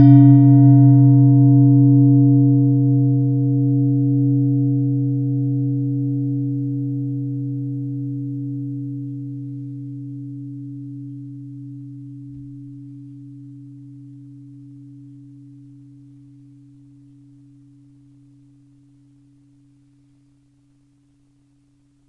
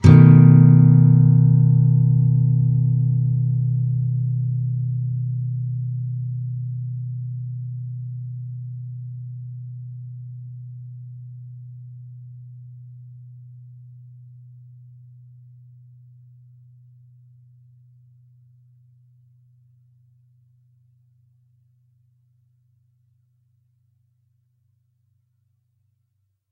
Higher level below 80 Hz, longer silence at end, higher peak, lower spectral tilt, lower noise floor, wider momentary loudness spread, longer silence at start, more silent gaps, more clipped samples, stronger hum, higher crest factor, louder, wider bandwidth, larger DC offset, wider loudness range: second, -68 dBFS vs -50 dBFS; second, 8 s vs 13.35 s; about the same, 0 dBFS vs 0 dBFS; first, -13.5 dB/octave vs -10.5 dB/octave; second, -58 dBFS vs -71 dBFS; about the same, 26 LU vs 28 LU; about the same, 0 s vs 0 s; neither; neither; neither; about the same, 18 dB vs 20 dB; about the same, -16 LUFS vs -18 LUFS; second, 2 kHz vs 4.3 kHz; neither; about the same, 25 LU vs 27 LU